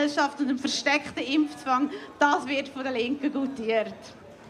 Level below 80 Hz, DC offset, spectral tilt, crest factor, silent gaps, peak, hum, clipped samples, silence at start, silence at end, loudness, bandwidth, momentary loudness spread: -68 dBFS; under 0.1%; -3 dB/octave; 20 dB; none; -8 dBFS; none; under 0.1%; 0 s; 0 s; -27 LUFS; 11 kHz; 7 LU